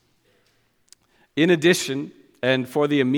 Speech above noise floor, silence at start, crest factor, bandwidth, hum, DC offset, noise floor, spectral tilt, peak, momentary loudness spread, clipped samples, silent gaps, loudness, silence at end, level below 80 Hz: 45 dB; 1.35 s; 20 dB; 17.5 kHz; none; under 0.1%; -65 dBFS; -5 dB/octave; -4 dBFS; 13 LU; under 0.1%; none; -21 LUFS; 0 s; -68 dBFS